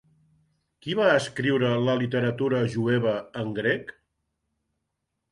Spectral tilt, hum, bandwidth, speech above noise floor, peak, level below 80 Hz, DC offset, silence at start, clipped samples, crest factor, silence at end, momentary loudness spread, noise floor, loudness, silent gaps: -6.5 dB/octave; none; 11.5 kHz; 56 dB; -8 dBFS; -64 dBFS; under 0.1%; 0.85 s; under 0.1%; 18 dB; 1.4 s; 9 LU; -80 dBFS; -25 LUFS; none